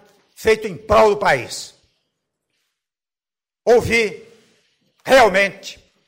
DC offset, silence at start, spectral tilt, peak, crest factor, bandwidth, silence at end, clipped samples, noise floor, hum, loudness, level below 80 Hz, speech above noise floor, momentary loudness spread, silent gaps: under 0.1%; 0.4 s; -4 dB/octave; -4 dBFS; 14 dB; 16 kHz; 0.35 s; under 0.1%; under -90 dBFS; none; -16 LUFS; -44 dBFS; over 74 dB; 20 LU; none